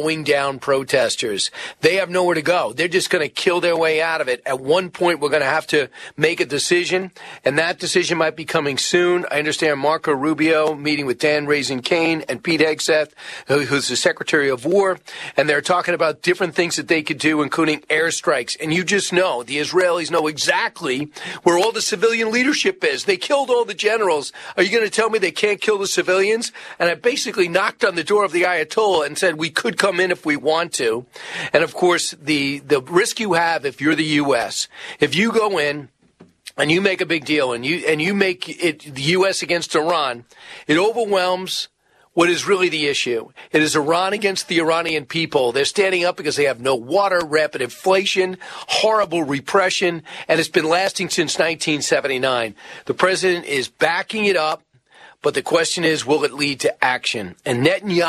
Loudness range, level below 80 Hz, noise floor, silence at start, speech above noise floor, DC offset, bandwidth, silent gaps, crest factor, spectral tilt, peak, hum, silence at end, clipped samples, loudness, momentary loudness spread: 1 LU; -64 dBFS; -51 dBFS; 0 s; 32 dB; under 0.1%; 13.5 kHz; none; 18 dB; -3.5 dB/octave; 0 dBFS; none; 0 s; under 0.1%; -19 LUFS; 6 LU